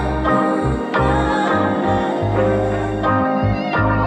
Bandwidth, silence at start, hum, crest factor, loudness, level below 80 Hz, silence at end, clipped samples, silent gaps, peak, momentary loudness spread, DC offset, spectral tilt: 9.2 kHz; 0 s; none; 12 dB; -18 LUFS; -30 dBFS; 0 s; under 0.1%; none; -4 dBFS; 2 LU; under 0.1%; -7.5 dB/octave